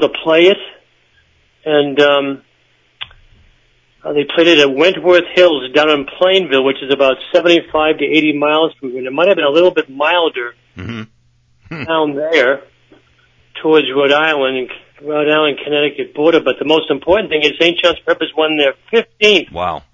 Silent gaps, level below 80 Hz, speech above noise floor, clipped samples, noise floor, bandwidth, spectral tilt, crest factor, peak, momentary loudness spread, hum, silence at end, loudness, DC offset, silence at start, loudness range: none; -50 dBFS; 43 dB; under 0.1%; -56 dBFS; 7.6 kHz; -4.5 dB/octave; 14 dB; 0 dBFS; 17 LU; none; 0.15 s; -13 LUFS; under 0.1%; 0 s; 6 LU